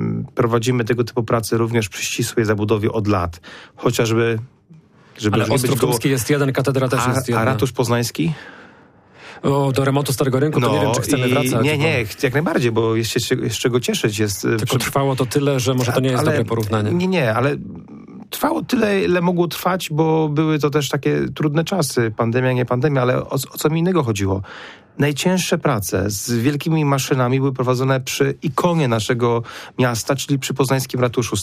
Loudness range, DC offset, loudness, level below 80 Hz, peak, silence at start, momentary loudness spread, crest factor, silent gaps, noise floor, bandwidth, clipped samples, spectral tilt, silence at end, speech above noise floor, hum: 2 LU; under 0.1%; -19 LUFS; -50 dBFS; -6 dBFS; 0 s; 4 LU; 14 dB; none; -48 dBFS; 15.5 kHz; under 0.1%; -5.5 dB/octave; 0 s; 30 dB; none